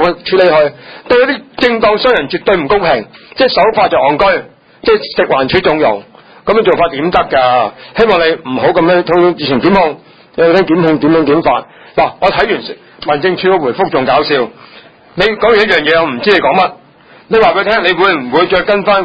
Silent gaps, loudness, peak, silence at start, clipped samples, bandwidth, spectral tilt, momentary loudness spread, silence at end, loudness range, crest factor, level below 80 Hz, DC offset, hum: none; -11 LUFS; 0 dBFS; 0 s; 0.1%; 8 kHz; -7 dB/octave; 7 LU; 0 s; 2 LU; 10 dB; -40 dBFS; under 0.1%; none